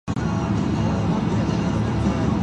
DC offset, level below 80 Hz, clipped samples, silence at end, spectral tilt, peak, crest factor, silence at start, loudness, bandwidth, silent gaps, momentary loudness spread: under 0.1%; -34 dBFS; under 0.1%; 0 s; -7.5 dB/octave; -8 dBFS; 14 dB; 0.05 s; -22 LUFS; 10 kHz; none; 1 LU